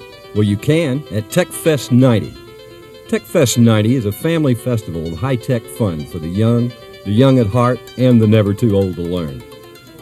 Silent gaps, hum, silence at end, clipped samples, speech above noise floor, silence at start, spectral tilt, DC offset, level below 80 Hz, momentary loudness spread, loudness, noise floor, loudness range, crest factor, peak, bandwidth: none; none; 0 s; under 0.1%; 23 dB; 0 s; -6.5 dB/octave; under 0.1%; -46 dBFS; 11 LU; -16 LUFS; -38 dBFS; 2 LU; 16 dB; 0 dBFS; 14.5 kHz